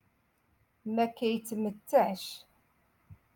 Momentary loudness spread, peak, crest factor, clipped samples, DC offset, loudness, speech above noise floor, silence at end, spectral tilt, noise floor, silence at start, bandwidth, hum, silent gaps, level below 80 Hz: 16 LU; -12 dBFS; 22 dB; under 0.1%; under 0.1%; -31 LUFS; 41 dB; 0.2 s; -5 dB/octave; -72 dBFS; 0.85 s; 17.5 kHz; none; none; -74 dBFS